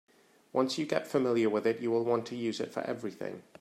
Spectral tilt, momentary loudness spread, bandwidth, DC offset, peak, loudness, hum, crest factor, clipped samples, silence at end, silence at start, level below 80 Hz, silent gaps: -5.5 dB/octave; 10 LU; 13.5 kHz; under 0.1%; -14 dBFS; -32 LUFS; none; 18 dB; under 0.1%; 0.2 s; 0.55 s; -80 dBFS; none